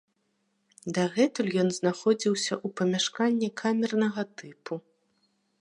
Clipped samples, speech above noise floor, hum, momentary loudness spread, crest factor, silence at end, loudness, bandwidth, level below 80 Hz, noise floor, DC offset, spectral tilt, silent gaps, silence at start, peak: under 0.1%; 47 dB; none; 13 LU; 16 dB; 0.8 s; -27 LUFS; 11 kHz; -76 dBFS; -74 dBFS; under 0.1%; -4.5 dB/octave; none; 0.85 s; -12 dBFS